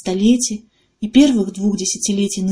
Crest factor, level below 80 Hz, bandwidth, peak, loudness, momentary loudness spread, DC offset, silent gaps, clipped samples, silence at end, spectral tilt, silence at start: 16 dB; -46 dBFS; 10.5 kHz; -2 dBFS; -16 LUFS; 9 LU; under 0.1%; none; under 0.1%; 0 s; -4.5 dB/octave; 0.05 s